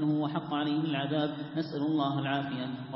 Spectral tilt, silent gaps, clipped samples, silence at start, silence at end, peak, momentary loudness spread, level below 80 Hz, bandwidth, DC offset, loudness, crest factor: -10.5 dB/octave; none; under 0.1%; 0 s; 0 s; -16 dBFS; 5 LU; -72 dBFS; 5.8 kHz; under 0.1%; -32 LUFS; 14 dB